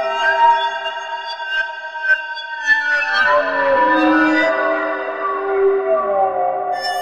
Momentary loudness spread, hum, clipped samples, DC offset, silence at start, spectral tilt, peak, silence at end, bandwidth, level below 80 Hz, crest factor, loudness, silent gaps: 10 LU; none; under 0.1%; 0.2%; 0 s; -3 dB/octave; -4 dBFS; 0 s; 13 kHz; -58 dBFS; 14 dB; -17 LUFS; none